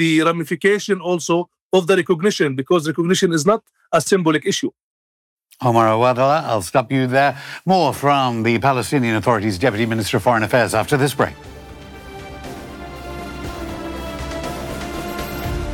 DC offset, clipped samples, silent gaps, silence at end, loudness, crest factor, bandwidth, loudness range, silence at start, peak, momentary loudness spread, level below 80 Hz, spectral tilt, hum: under 0.1%; under 0.1%; 1.61-1.70 s, 4.83-5.37 s; 0 s; -18 LUFS; 14 dB; 18 kHz; 11 LU; 0 s; -4 dBFS; 16 LU; -40 dBFS; -5 dB/octave; none